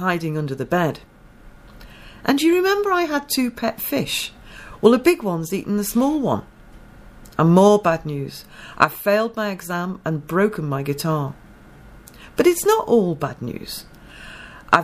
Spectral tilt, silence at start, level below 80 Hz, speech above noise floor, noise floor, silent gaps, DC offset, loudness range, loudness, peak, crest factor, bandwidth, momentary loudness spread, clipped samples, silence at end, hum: -5.5 dB/octave; 0 s; -48 dBFS; 25 dB; -44 dBFS; none; under 0.1%; 3 LU; -20 LUFS; 0 dBFS; 20 dB; 15.5 kHz; 16 LU; under 0.1%; 0 s; none